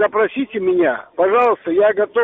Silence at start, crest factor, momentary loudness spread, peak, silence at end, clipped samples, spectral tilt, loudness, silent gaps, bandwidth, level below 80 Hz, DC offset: 0 s; 12 dB; 5 LU; -4 dBFS; 0 s; under 0.1%; -3.5 dB/octave; -17 LUFS; none; 4 kHz; -60 dBFS; under 0.1%